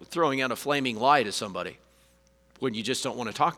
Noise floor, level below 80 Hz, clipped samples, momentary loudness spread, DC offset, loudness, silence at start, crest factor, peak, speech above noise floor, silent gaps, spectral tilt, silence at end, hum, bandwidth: -62 dBFS; -66 dBFS; under 0.1%; 11 LU; under 0.1%; -27 LUFS; 0 s; 22 dB; -6 dBFS; 35 dB; none; -3.5 dB/octave; 0 s; none; 19.5 kHz